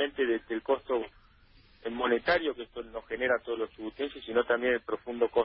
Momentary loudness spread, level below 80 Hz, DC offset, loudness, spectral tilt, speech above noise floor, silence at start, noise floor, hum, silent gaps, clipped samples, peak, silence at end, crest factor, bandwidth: 12 LU; -60 dBFS; under 0.1%; -31 LUFS; -8 dB/octave; 29 dB; 0 s; -59 dBFS; none; none; under 0.1%; -14 dBFS; 0 s; 18 dB; 5.8 kHz